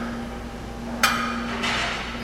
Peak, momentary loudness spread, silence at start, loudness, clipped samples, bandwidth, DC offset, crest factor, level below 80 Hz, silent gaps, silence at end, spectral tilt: -4 dBFS; 13 LU; 0 s; -25 LUFS; under 0.1%; 16 kHz; under 0.1%; 24 dB; -40 dBFS; none; 0 s; -3 dB/octave